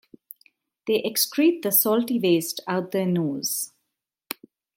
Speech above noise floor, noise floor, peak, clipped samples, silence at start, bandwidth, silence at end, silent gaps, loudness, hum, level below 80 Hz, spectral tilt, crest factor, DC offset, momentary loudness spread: 59 dB; -81 dBFS; -6 dBFS; under 0.1%; 0.85 s; 17 kHz; 0.45 s; none; -23 LUFS; none; -76 dBFS; -4 dB/octave; 20 dB; under 0.1%; 18 LU